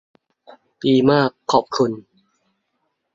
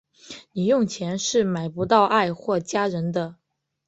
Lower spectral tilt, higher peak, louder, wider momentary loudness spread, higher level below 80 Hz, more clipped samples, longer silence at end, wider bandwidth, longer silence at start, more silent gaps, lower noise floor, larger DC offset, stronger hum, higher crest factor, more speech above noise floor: about the same, -6 dB/octave vs -5 dB/octave; about the same, -2 dBFS vs -4 dBFS; first, -18 LUFS vs -23 LUFS; second, 9 LU vs 15 LU; about the same, -58 dBFS vs -62 dBFS; neither; first, 1.15 s vs 0.55 s; about the same, 7.6 kHz vs 8.2 kHz; first, 0.85 s vs 0.25 s; neither; first, -73 dBFS vs -45 dBFS; neither; neither; about the same, 20 dB vs 20 dB; first, 55 dB vs 22 dB